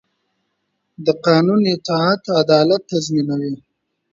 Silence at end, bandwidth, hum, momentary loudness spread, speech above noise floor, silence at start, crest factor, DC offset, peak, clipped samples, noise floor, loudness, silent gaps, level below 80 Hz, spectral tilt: 0.55 s; 7.8 kHz; none; 9 LU; 55 dB; 1 s; 18 dB; under 0.1%; 0 dBFS; under 0.1%; -72 dBFS; -17 LUFS; none; -62 dBFS; -6 dB/octave